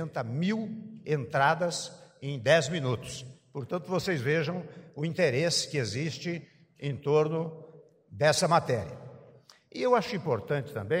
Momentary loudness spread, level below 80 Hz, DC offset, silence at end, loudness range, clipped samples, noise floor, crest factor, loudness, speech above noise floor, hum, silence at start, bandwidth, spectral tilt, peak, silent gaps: 17 LU; -66 dBFS; under 0.1%; 0 s; 1 LU; under 0.1%; -57 dBFS; 20 dB; -29 LUFS; 28 dB; none; 0 s; 16 kHz; -5 dB/octave; -10 dBFS; none